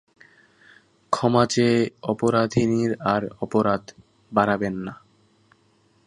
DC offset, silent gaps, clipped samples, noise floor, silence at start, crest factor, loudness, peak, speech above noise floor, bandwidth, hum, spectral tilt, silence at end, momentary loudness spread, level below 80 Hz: under 0.1%; none; under 0.1%; -62 dBFS; 1.1 s; 22 dB; -22 LUFS; -2 dBFS; 40 dB; 11 kHz; none; -6 dB/octave; 1.1 s; 9 LU; -56 dBFS